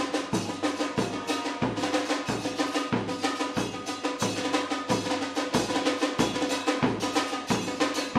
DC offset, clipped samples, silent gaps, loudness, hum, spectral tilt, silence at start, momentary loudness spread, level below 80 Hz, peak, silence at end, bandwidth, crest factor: under 0.1%; under 0.1%; none; -28 LUFS; none; -4 dB/octave; 0 s; 4 LU; -58 dBFS; -10 dBFS; 0 s; 15.5 kHz; 18 dB